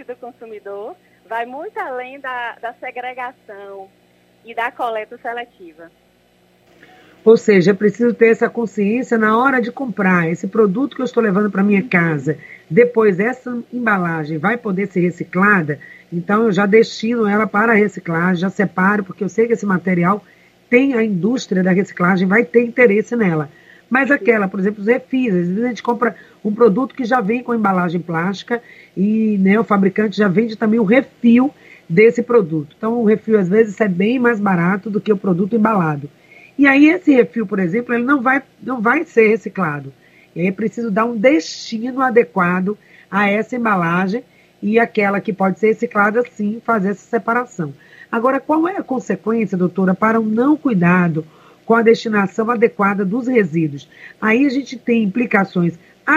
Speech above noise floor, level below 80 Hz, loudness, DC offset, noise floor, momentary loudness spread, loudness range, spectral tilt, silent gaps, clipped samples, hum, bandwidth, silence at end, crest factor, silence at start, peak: 39 dB; -64 dBFS; -16 LUFS; under 0.1%; -55 dBFS; 13 LU; 4 LU; -7.5 dB/octave; none; under 0.1%; none; 8 kHz; 0 s; 16 dB; 0 s; 0 dBFS